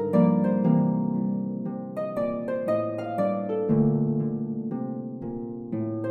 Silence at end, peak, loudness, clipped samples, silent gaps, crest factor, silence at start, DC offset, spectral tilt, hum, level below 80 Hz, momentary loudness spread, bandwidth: 0 s; -10 dBFS; -27 LUFS; under 0.1%; none; 16 dB; 0 s; under 0.1%; -11 dB/octave; none; -58 dBFS; 11 LU; 4.6 kHz